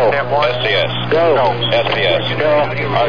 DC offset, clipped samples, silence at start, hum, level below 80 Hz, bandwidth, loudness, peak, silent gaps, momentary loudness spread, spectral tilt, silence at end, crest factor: 3%; under 0.1%; 0 s; none; -44 dBFS; 5.4 kHz; -14 LUFS; -4 dBFS; none; 2 LU; -6.5 dB/octave; 0 s; 12 dB